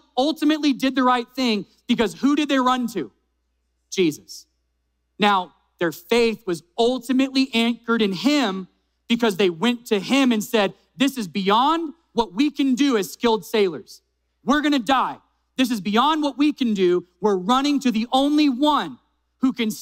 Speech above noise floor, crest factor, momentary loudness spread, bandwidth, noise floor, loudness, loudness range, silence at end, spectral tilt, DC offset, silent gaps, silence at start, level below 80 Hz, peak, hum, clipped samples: 51 dB; 18 dB; 8 LU; 16 kHz; -72 dBFS; -21 LUFS; 3 LU; 0 s; -4.5 dB/octave; under 0.1%; none; 0.15 s; -56 dBFS; -4 dBFS; none; under 0.1%